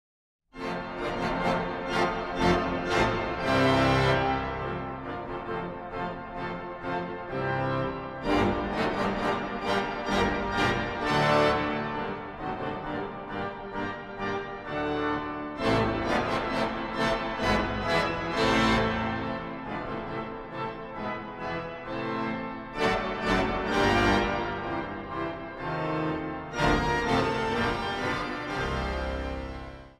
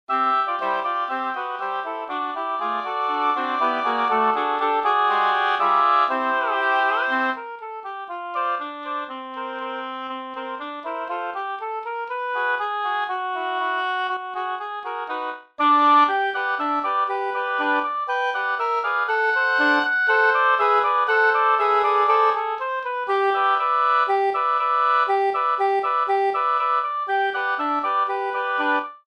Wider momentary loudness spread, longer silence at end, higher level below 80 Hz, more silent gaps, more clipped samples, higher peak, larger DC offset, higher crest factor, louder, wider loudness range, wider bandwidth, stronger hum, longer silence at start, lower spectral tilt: about the same, 12 LU vs 12 LU; about the same, 0.05 s vs 0.1 s; first, -44 dBFS vs -74 dBFS; neither; neither; second, -10 dBFS vs -6 dBFS; neither; about the same, 20 dB vs 16 dB; second, -29 LUFS vs -21 LUFS; about the same, 7 LU vs 9 LU; first, 15.5 kHz vs 8.8 kHz; neither; first, 0.55 s vs 0.1 s; first, -5.5 dB/octave vs -3 dB/octave